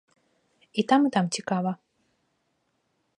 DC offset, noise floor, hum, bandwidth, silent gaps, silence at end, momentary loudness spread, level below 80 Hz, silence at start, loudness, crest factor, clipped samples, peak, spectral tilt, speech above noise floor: under 0.1%; -74 dBFS; none; 11 kHz; none; 1.45 s; 11 LU; -78 dBFS; 0.75 s; -25 LUFS; 20 dB; under 0.1%; -8 dBFS; -5 dB/octave; 50 dB